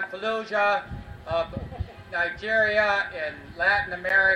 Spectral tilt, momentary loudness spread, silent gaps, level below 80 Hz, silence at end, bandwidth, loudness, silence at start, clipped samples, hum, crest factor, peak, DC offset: -5 dB/octave; 14 LU; none; -46 dBFS; 0 s; 11 kHz; -25 LUFS; 0 s; under 0.1%; none; 16 dB; -8 dBFS; under 0.1%